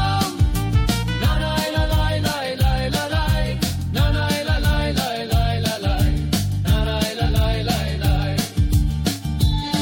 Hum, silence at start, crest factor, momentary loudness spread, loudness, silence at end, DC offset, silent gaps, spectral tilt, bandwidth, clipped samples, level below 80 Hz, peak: none; 0 s; 16 dB; 2 LU; -21 LUFS; 0 s; under 0.1%; none; -5.5 dB/octave; 17 kHz; under 0.1%; -24 dBFS; -4 dBFS